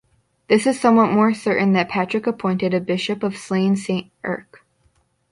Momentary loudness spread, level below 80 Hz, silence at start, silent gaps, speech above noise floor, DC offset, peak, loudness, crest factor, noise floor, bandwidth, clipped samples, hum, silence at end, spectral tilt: 10 LU; -62 dBFS; 0.5 s; none; 44 dB; under 0.1%; -2 dBFS; -19 LUFS; 18 dB; -63 dBFS; 11.5 kHz; under 0.1%; none; 0.9 s; -6 dB/octave